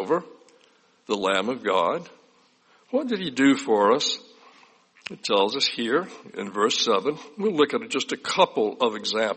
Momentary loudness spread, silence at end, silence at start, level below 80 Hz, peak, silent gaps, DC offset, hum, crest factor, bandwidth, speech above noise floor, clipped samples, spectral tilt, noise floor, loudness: 11 LU; 0 s; 0 s; -72 dBFS; -4 dBFS; none; under 0.1%; none; 20 dB; 8.8 kHz; 36 dB; under 0.1%; -3.5 dB/octave; -60 dBFS; -24 LUFS